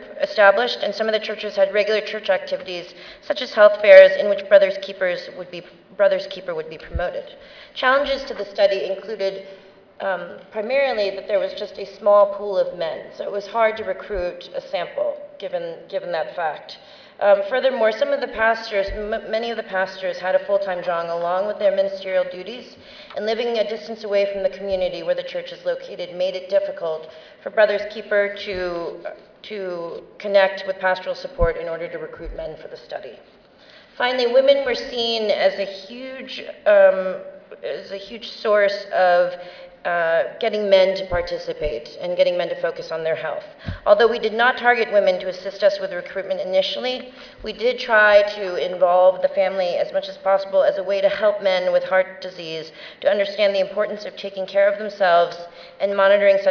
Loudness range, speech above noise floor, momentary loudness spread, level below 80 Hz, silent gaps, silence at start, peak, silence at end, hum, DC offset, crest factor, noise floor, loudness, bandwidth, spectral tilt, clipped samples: 8 LU; 28 dB; 17 LU; -46 dBFS; none; 0 s; 0 dBFS; 0 s; none; under 0.1%; 20 dB; -48 dBFS; -20 LUFS; 5.4 kHz; -4.5 dB/octave; under 0.1%